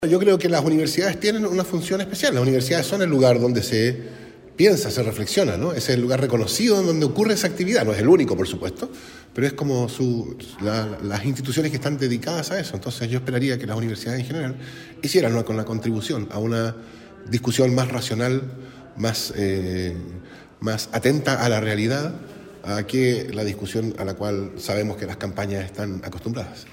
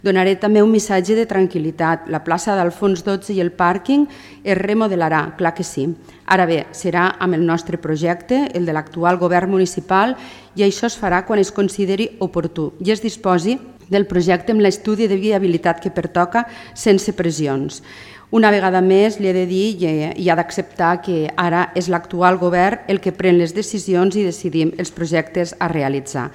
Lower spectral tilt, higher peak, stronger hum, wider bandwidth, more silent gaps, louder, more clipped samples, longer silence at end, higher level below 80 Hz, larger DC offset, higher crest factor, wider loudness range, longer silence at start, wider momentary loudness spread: about the same, -5.5 dB/octave vs -5.5 dB/octave; second, -4 dBFS vs 0 dBFS; neither; first, 16.5 kHz vs 13.5 kHz; neither; second, -22 LUFS vs -17 LUFS; neither; about the same, 0 s vs 0 s; about the same, -52 dBFS vs -50 dBFS; neither; about the same, 18 dB vs 18 dB; first, 5 LU vs 2 LU; about the same, 0 s vs 0.05 s; first, 13 LU vs 7 LU